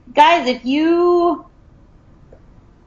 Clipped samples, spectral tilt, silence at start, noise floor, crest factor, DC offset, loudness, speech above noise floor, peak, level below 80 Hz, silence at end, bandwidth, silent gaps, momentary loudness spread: under 0.1%; -4.5 dB/octave; 0.15 s; -47 dBFS; 18 dB; under 0.1%; -15 LUFS; 33 dB; 0 dBFS; -50 dBFS; 1.45 s; 7.4 kHz; none; 7 LU